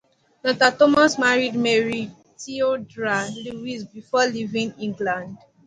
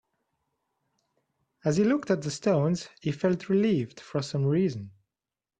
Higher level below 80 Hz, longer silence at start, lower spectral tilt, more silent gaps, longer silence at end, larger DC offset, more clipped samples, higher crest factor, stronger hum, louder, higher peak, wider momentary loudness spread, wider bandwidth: about the same, -62 dBFS vs -66 dBFS; second, 0.45 s vs 1.65 s; second, -4 dB/octave vs -7 dB/octave; neither; second, 0.3 s vs 0.7 s; neither; neither; about the same, 20 dB vs 18 dB; neither; first, -21 LUFS vs -27 LUFS; first, -2 dBFS vs -12 dBFS; first, 16 LU vs 9 LU; about the same, 10.5 kHz vs 9.6 kHz